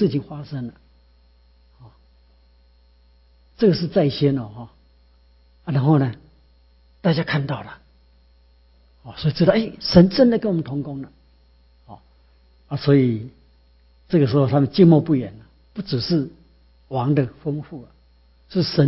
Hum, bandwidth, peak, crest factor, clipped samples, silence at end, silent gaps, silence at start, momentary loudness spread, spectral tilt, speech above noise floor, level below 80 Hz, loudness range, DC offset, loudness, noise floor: none; 5.8 kHz; 0 dBFS; 22 dB; under 0.1%; 0 s; none; 0 s; 21 LU; -11 dB/octave; 36 dB; -50 dBFS; 7 LU; under 0.1%; -20 LUFS; -55 dBFS